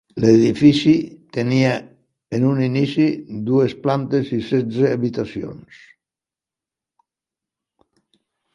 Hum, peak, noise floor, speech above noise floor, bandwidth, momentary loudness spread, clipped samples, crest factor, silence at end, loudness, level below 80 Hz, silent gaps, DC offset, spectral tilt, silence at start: none; 0 dBFS; -89 dBFS; 72 dB; 11 kHz; 13 LU; under 0.1%; 20 dB; 2.95 s; -18 LUFS; -56 dBFS; none; under 0.1%; -7.5 dB/octave; 0.15 s